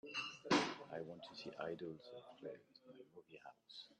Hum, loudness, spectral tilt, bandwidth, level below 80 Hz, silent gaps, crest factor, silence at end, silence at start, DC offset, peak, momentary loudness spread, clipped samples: none; -45 LUFS; -4 dB/octave; 9.2 kHz; -86 dBFS; none; 24 dB; 0.05 s; 0.05 s; under 0.1%; -22 dBFS; 23 LU; under 0.1%